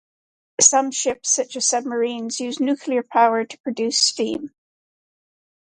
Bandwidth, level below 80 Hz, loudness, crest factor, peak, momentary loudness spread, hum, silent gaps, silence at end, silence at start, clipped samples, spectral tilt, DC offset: 11 kHz; -70 dBFS; -19 LUFS; 22 dB; 0 dBFS; 12 LU; none; 3.60-3.64 s; 1.3 s; 0.6 s; under 0.1%; -1 dB/octave; under 0.1%